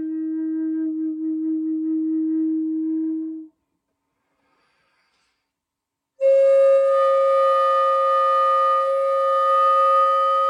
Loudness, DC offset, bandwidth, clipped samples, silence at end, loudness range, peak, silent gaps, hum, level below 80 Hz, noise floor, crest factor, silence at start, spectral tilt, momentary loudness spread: -19 LUFS; under 0.1%; 11 kHz; under 0.1%; 0 s; 12 LU; -10 dBFS; none; none; -88 dBFS; -83 dBFS; 10 dB; 0 s; -4 dB/octave; 10 LU